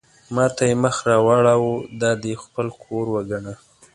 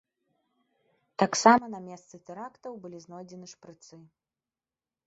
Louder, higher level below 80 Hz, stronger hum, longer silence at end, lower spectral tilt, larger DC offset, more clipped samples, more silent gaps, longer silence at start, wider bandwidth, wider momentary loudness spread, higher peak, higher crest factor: first, -20 LUFS vs -23 LUFS; first, -54 dBFS vs -74 dBFS; neither; second, 0.4 s vs 1.35 s; first, -5.5 dB/octave vs -3.5 dB/octave; neither; neither; neither; second, 0.3 s vs 1.2 s; first, 11.5 kHz vs 8 kHz; second, 13 LU vs 25 LU; about the same, -2 dBFS vs -4 dBFS; second, 18 dB vs 28 dB